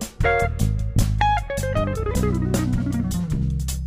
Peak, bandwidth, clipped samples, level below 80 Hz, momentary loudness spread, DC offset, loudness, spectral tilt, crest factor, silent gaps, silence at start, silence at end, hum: -6 dBFS; 16 kHz; under 0.1%; -28 dBFS; 4 LU; under 0.1%; -23 LUFS; -6 dB/octave; 14 dB; none; 0 s; 0 s; none